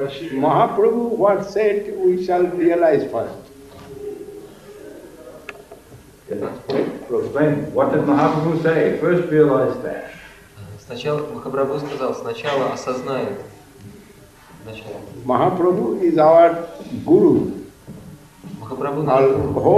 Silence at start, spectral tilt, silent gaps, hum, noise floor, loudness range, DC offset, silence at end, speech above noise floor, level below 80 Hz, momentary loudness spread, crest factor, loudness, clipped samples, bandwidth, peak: 0 s; -7.5 dB/octave; none; none; -45 dBFS; 10 LU; under 0.1%; 0 s; 28 dB; -52 dBFS; 22 LU; 18 dB; -18 LUFS; under 0.1%; 14 kHz; -2 dBFS